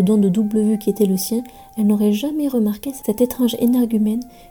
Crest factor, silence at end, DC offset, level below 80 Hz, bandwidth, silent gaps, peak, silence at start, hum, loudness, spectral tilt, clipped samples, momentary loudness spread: 14 dB; 0.2 s; under 0.1%; -52 dBFS; 19.5 kHz; none; -4 dBFS; 0 s; none; -19 LUFS; -6.5 dB/octave; under 0.1%; 8 LU